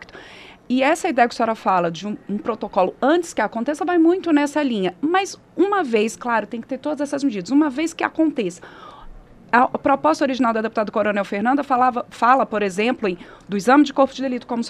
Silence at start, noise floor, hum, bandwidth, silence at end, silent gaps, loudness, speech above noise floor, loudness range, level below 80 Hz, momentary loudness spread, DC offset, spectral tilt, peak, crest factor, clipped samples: 0 s; -43 dBFS; none; 12.5 kHz; 0 s; none; -20 LUFS; 23 dB; 3 LU; -54 dBFS; 10 LU; under 0.1%; -5 dB/octave; -2 dBFS; 18 dB; under 0.1%